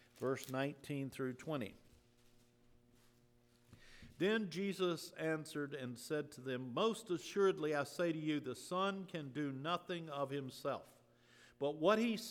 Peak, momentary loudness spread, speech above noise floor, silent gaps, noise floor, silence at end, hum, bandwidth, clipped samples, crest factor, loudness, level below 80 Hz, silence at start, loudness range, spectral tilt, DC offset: -20 dBFS; 9 LU; 31 dB; none; -71 dBFS; 0 s; none; 19 kHz; under 0.1%; 22 dB; -40 LUFS; -76 dBFS; 0.15 s; 7 LU; -5.5 dB/octave; under 0.1%